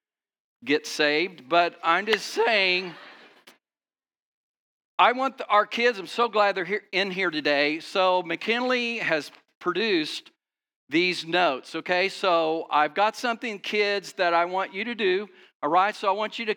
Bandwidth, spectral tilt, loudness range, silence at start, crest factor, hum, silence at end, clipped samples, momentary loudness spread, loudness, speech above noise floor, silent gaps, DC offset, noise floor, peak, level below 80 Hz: 19 kHz; -3.5 dB/octave; 3 LU; 0.6 s; 22 dB; none; 0 s; under 0.1%; 7 LU; -24 LUFS; over 65 dB; 4.22-4.98 s, 9.55-9.61 s, 10.76-10.87 s, 15.55-15.60 s; under 0.1%; under -90 dBFS; -4 dBFS; under -90 dBFS